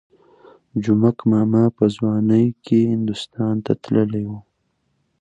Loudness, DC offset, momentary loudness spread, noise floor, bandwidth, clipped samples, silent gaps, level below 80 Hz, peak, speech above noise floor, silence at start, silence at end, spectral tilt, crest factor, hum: -19 LUFS; under 0.1%; 9 LU; -69 dBFS; 8 kHz; under 0.1%; none; -56 dBFS; -4 dBFS; 51 dB; 0.75 s; 0.8 s; -8.5 dB/octave; 16 dB; none